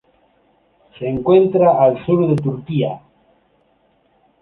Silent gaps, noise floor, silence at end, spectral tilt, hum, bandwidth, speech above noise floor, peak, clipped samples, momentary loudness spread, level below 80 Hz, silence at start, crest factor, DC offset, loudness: none; -59 dBFS; 1.45 s; -10 dB/octave; none; 4.1 kHz; 44 dB; -2 dBFS; under 0.1%; 12 LU; -54 dBFS; 1 s; 16 dB; under 0.1%; -16 LUFS